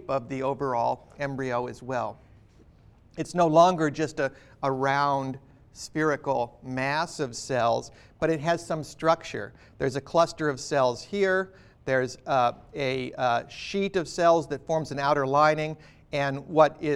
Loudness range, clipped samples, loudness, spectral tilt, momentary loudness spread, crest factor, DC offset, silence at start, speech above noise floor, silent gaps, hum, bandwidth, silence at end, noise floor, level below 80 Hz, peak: 3 LU; under 0.1%; -27 LUFS; -5.5 dB/octave; 12 LU; 22 dB; under 0.1%; 0 s; 29 dB; none; none; 12.5 kHz; 0 s; -55 dBFS; -58 dBFS; -6 dBFS